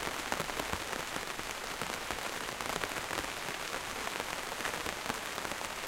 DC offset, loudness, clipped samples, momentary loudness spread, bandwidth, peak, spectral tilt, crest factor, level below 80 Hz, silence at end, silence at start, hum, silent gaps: under 0.1%; -37 LUFS; under 0.1%; 2 LU; 17 kHz; -12 dBFS; -2 dB/octave; 26 dB; -56 dBFS; 0 s; 0 s; none; none